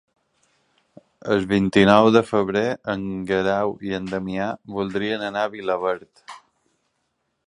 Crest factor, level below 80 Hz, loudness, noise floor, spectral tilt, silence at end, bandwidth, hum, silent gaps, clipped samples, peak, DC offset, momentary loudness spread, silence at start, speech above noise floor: 22 dB; -54 dBFS; -21 LUFS; -73 dBFS; -6.5 dB/octave; 1.1 s; 11 kHz; none; none; under 0.1%; 0 dBFS; under 0.1%; 13 LU; 1.25 s; 53 dB